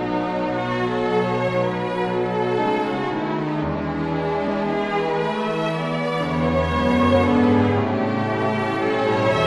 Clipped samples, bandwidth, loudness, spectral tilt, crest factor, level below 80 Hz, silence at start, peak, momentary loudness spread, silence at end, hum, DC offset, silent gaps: under 0.1%; 11.5 kHz; -21 LUFS; -7 dB/octave; 16 dB; -44 dBFS; 0 s; -4 dBFS; 7 LU; 0 s; none; under 0.1%; none